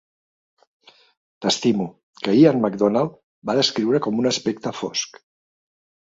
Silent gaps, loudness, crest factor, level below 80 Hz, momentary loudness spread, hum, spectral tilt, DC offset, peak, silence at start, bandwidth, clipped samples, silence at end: 2.03-2.13 s, 3.23-3.42 s; -20 LUFS; 20 dB; -64 dBFS; 12 LU; none; -5 dB/octave; under 0.1%; -2 dBFS; 1.4 s; 7.8 kHz; under 0.1%; 1.05 s